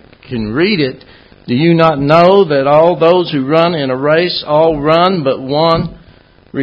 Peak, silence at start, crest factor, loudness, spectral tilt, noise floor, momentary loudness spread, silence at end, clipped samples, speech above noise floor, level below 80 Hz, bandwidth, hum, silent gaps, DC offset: 0 dBFS; 0.3 s; 12 dB; -11 LUFS; -8.5 dB/octave; -43 dBFS; 10 LU; 0 s; 0.3%; 33 dB; -42 dBFS; 8 kHz; none; none; under 0.1%